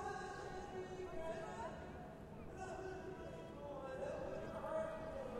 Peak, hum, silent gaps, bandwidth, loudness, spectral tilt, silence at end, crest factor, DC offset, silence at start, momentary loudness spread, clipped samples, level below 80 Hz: -32 dBFS; none; none; 16 kHz; -49 LUFS; -6 dB/octave; 0 s; 14 dB; under 0.1%; 0 s; 8 LU; under 0.1%; -62 dBFS